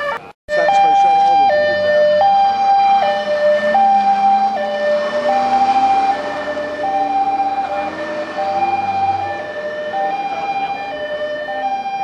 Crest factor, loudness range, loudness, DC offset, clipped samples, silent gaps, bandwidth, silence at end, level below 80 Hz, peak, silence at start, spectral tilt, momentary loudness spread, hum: 12 dB; 7 LU; -16 LUFS; under 0.1%; under 0.1%; 0.34-0.48 s; 8.4 kHz; 0 s; -56 dBFS; -4 dBFS; 0 s; -4 dB/octave; 10 LU; none